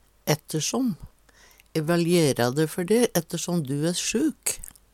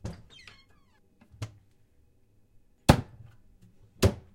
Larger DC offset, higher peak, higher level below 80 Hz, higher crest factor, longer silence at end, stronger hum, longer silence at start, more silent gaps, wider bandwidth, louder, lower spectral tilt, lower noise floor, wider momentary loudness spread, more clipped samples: neither; second, -6 dBFS vs -2 dBFS; second, -54 dBFS vs -42 dBFS; second, 20 dB vs 32 dB; about the same, 0.25 s vs 0.15 s; neither; first, 0.25 s vs 0.05 s; neither; first, 18 kHz vs 16 kHz; about the same, -25 LUFS vs -26 LUFS; second, -4.5 dB/octave vs -6 dB/octave; second, -56 dBFS vs -64 dBFS; second, 8 LU vs 26 LU; neither